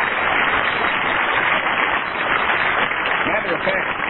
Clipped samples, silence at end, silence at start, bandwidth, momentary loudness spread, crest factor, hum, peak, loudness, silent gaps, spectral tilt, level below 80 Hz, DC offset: under 0.1%; 0 s; 0 s; 4.3 kHz; 3 LU; 14 dB; none; -4 dBFS; -18 LUFS; none; -7 dB/octave; -46 dBFS; under 0.1%